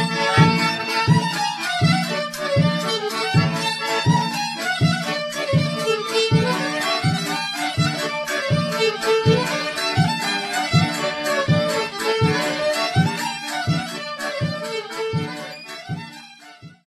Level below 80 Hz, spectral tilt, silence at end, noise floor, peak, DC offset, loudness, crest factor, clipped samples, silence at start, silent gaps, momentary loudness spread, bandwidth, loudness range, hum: -52 dBFS; -5 dB/octave; 0.15 s; -43 dBFS; -2 dBFS; under 0.1%; -20 LUFS; 18 dB; under 0.1%; 0 s; none; 8 LU; 14 kHz; 3 LU; none